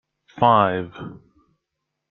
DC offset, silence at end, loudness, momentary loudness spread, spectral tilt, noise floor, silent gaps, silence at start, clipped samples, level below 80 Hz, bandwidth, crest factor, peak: under 0.1%; 0.95 s; -19 LUFS; 22 LU; -8.5 dB/octave; -80 dBFS; none; 0.35 s; under 0.1%; -60 dBFS; 6.4 kHz; 22 dB; -2 dBFS